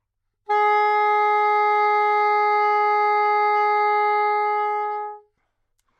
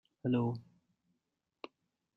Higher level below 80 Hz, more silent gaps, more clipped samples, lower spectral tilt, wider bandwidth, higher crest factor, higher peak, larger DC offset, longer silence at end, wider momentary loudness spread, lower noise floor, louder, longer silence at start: about the same, -78 dBFS vs -76 dBFS; neither; neither; second, -1 dB/octave vs -10 dB/octave; first, 6.2 kHz vs 5.2 kHz; second, 10 dB vs 20 dB; first, -10 dBFS vs -20 dBFS; neither; second, 0.8 s vs 1.55 s; second, 6 LU vs 20 LU; second, -72 dBFS vs -86 dBFS; first, -19 LUFS vs -36 LUFS; first, 0.5 s vs 0.25 s